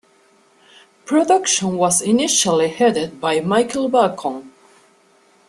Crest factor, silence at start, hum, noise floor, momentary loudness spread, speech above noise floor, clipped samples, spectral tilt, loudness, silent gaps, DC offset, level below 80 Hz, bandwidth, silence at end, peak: 18 dB; 1.05 s; none; -55 dBFS; 6 LU; 38 dB; under 0.1%; -3 dB/octave; -17 LUFS; none; under 0.1%; -60 dBFS; 13 kHz; 1 s; -2 dBFS